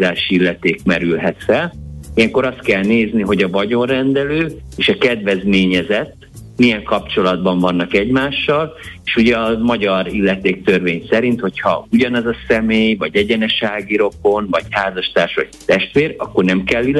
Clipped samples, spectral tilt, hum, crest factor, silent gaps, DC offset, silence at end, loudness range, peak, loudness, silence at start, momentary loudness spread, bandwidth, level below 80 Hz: under 0.1%; -6 dB/octave; none; 14 dB; none; under 0.1%; 0 s; 1 LU; -2 dBFS; -15 LUFS; 0 s; 5 LU; 12 kHz; -40 dBFS